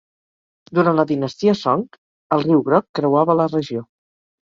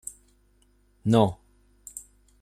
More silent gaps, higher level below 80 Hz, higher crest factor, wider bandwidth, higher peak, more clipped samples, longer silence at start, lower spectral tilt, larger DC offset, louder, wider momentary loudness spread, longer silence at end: first, 1.98-2.30 s, 2.89-2.94 s vs none; about the same, -62 dBFS vs -58 dBFS; second, 16 dB vs 22 dB; second, 7.4 kHz vs 15 kHz; first, -2 dBFS vs -6 dBFS; neither; second, 0.7 s vs 1.05 s; about the same, -7.5 dB/octave vs -6.5 dB/octave; neither; first, -18 LUFS vs -24 LUFS; second, 8 LU vs 24 LU; first, 0.65 s vs 0.4 s